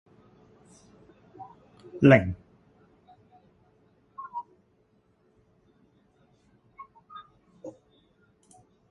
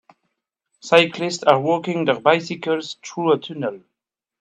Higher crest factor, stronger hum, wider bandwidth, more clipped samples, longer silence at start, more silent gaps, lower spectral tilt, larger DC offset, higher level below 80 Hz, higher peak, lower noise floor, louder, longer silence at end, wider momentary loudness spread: first, 28 dB vs 20 dB; neither; about the same, 9.4 kHz vs 10 kHz; neither; first, 1.4 s vs 0.85 s; neither; first, -8.5 dB/octave vs -4.5 dB/octave; neither; first, -56 dBFS vs -70 dBFS; second, -4 dBFS vs 0 dBFS; second, -67 dBFS vs -83 dBFS; second, -23 LUFS vs -19 LUFS; first, 1.2 s vs 0.65 s; first, 31 LU vs 12 LU